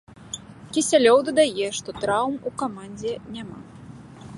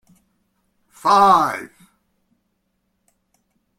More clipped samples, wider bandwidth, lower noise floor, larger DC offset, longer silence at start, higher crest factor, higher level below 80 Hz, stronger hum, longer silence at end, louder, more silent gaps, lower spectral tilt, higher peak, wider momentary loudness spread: neither; second, 11.5 kHz vs 16 kHz; second, -42 dBFS vs -71 dBFS; neither; second, 0.2 s vs 1.05 s; about the same, 20 dB vs 20 dB; about the same, -58 dBFS vs -62 dBFS; neither; second, 0 s vs 2.15 s; second, -22 LUFS vs -15 LUFS; neither; about the same, -3.5 dB/octave vs -4 dB/octave; about the same, -4 dBFS vs -2 dBFS; first, 25 LU vs 20 LU